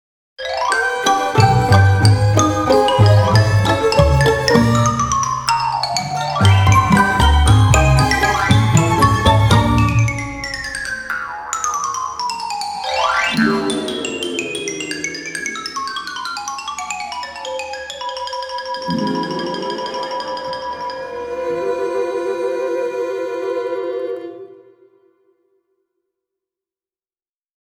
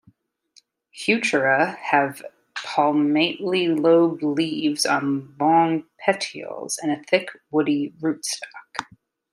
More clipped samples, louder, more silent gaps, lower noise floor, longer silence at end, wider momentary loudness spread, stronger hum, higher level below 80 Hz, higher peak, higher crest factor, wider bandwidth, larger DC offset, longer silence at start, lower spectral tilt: neither; first, -17 LUFS vs -22 LUFS; neither; first, under -90 dBFS vs -59 dBFS; first, 3.25 s vs 0.5 s; about the same, 13 LU vs 13 LU; neither; first, -28 dBFS vs -74 dBFS; about the same, 0 dBFS vs -2 dBFS; about the same, 16 dB vs 20 dB; about the same, 16 kHz vs 15.5 kHz; neither; second, 0.4 s vs 0.95 s; about the same, -5 dB/octave vs -4 dB/octave